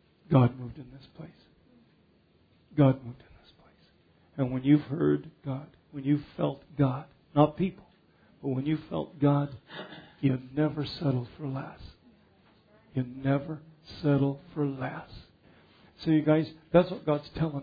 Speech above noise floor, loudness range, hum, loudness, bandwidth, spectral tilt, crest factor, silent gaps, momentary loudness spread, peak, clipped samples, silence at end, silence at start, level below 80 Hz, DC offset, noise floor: 36 dB; 4 LU; none; -29 LUFS; 5 kHz; -10.5 dB/octave; 22 dB; none; 19 LU; -8 dBFS; under 0.1%; 0 s; 0.3 s; -58 dBFS; under 0.1%; -64 dBFS